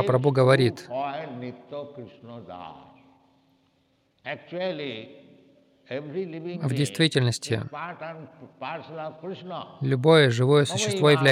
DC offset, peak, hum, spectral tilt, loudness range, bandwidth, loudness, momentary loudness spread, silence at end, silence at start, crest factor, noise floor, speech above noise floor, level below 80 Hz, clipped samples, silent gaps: under 0.1%; -6 dBFS; none; -5.5 dB/octave; 14 LU; 14 kHz; -24 LUFS; 22 LU; 0 s; 0 s; 20 dB; -67 dBFS; 43 dB; -72 dBFS; under 0.1%; none